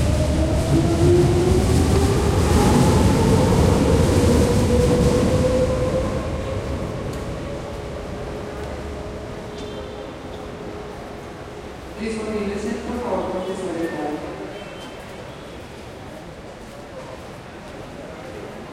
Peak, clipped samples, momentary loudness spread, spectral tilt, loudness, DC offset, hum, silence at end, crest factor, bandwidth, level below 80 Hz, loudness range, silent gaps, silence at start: -6 dBFS; under 0.1%; 19 LU; -6.5 dB/octave; -20 LUFS; under 0.1%; none; 0 s; 16 dB; 15.5 kHz; -30 dBFS; 18 LU; none; 0 s